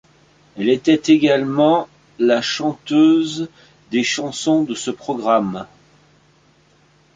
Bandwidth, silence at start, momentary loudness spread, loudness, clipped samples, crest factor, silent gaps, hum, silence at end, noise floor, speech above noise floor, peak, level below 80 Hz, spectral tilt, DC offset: 9.2 kHz; 0.55 s; 12 LU; -18 LUFS; under 0.1%; 16 dB; none; none; 1.5 s; -55 dBFS; 38 dB; -2 dBFS; -60 dBFS; -4.5 dB/octave; under 0.1%